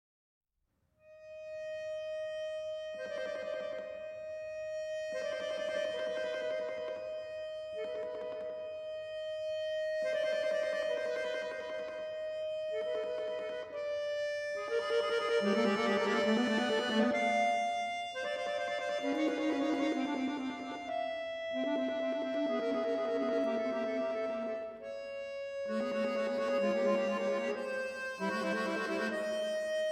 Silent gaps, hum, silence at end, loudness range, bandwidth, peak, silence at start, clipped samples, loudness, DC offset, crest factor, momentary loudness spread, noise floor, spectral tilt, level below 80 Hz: none; none; 0 s; 8 LU; 13 kHz; -18 dBFS; 1.05 s; under 0.1%; -35 LUFS; under 0.1%; 18 dB; 11 LU; -80 dBFS; -4.5 dB/octave; -76 dBFS